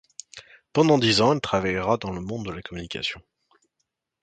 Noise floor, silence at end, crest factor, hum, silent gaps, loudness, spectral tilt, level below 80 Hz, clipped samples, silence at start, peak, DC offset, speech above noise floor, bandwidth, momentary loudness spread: -79 dBFS; 1 s; 20 dB; none; none; -23 LUFS; -5 dB/octave; -52 dBFS; under 0.1%; 0.35 s; -4 dBFS; under 0.1%; 55 dB; 9.4 kHz; 23 LU